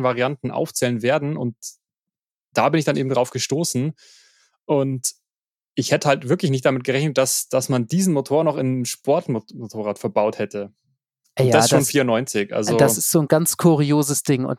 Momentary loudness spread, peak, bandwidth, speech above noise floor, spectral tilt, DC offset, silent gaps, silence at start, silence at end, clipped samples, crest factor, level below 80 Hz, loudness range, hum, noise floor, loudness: 11 LU; -2 dBFS; 17 kHz; over 70 dB; -5 dB/octave; under 0.1%; 2.31-2.48 s, 5.44-5.48 s, 5.55-5.59 s; 0 s; 0 s; under 0.1%; 18 dB; -66 dBFS; 6 LU; none; under -90 dBFS; -20 LUFS